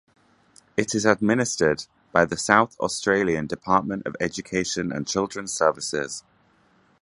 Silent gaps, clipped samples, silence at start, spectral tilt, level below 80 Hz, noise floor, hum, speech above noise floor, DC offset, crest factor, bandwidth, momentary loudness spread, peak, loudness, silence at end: none; under 0.1%; 0.75 s; -4 dB/octave; -56 dBFS; -61 dBFS; none; 38 dB; under 0.1%; 24 dB; 11.5 kHz; 9 LU; 0 dBFS; -23 LUFS; 0.8 s